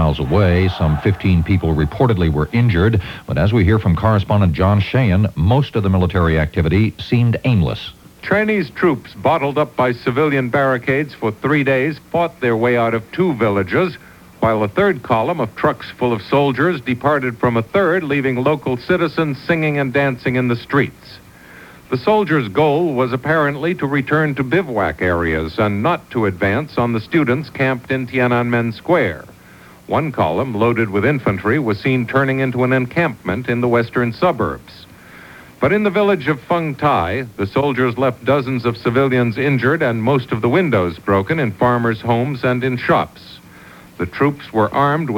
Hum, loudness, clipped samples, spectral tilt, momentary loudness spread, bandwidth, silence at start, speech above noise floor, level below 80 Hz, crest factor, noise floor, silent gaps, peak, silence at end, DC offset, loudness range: none; -17 LUFS; under 0.1%; -8 dB/octave; 5 LU; 18 kHz; 0 s; 26 dB; -36 dBFS; 16 dB; -42 dBFS; none; -2 dBFS; 0 s; under 0.1%; 3 LU